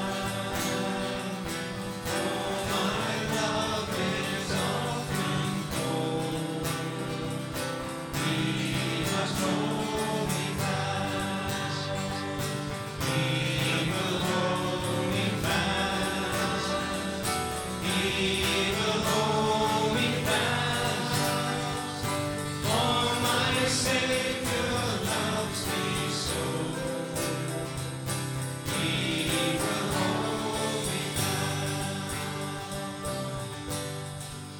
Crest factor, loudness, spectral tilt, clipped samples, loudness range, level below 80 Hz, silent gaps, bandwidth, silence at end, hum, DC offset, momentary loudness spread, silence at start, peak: 16 dB; -29 LUFS; -4 dB/octave; under 0.1%; 4 LU; -52 dBFS; none; 19.5 kHz; 0 s; none; under 0.1%; 8 LU; 0 s; -14 dBFS